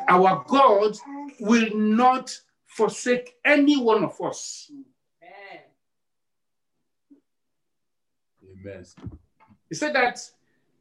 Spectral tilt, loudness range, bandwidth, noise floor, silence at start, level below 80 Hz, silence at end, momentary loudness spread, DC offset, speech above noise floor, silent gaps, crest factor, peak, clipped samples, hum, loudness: -4.5 dB/octave; 15 LU; 11.5 kHz; -87 dBFS; 0 s; -64 dBFS; 0.55 s; 24 LU; under 0.1%; 65 dB; none; 20 dB; -6 dBFS; under 0.1%; none; -21 LUFS